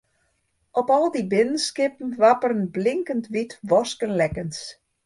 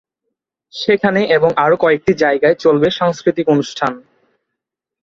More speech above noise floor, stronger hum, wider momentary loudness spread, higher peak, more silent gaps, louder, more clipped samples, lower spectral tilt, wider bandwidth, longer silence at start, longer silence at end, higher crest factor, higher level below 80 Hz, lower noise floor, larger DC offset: second, 48 dB vs 67 dB; neither; about the same, 10 LU vs 8 LU; second, -6 dBFS vs 0 dBFS; neither; second, -23 LUFS vs -14 LUFS; neither; about the same, -5 dB/octave vs -6 dB/octave; first, 11.5 kHz vs 7.6 kHz; about the same, 0.75 s vs 0.75 s; second, 0.35 s vs 1.05 s; about the same, 18 dB vs 16 dB; about the same, -56 dBFS vs -52 dBFS; second, -70 dBFS vs -81 dBFS; neither